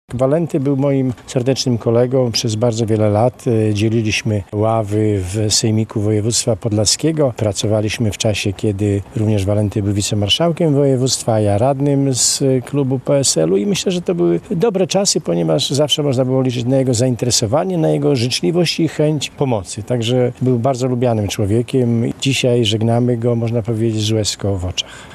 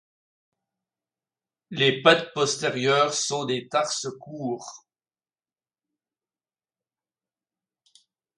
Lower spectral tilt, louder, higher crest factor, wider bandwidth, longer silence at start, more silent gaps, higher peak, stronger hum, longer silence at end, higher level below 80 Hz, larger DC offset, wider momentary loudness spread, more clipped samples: first, -5 dB/octave vs -3 dB/octave; first, -16 LUFS vs -23 LUFS; second, 16 dB vs 26 dB; first, 13.5 kHz vs 11.5 kHz; second, 0.1 s vs 1.7 s; neither; about the same, 0 dBFS vs -2 dBFS; neither; second, 0 s vs 3.6 s; first, -50 dBFS vs -74 dBFS; neither; second, 4 LU vs 16 LU; neither